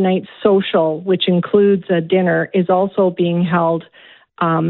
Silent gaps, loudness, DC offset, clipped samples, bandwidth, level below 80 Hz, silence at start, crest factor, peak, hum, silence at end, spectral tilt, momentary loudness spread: none; -16 LUFS; under 0.1%; under 0.1%; 4.2 kHz; -60 dBFS; 0 s; 14 dB; -2 dBFS; none; 0 s; -12 dB/octave; 4 LU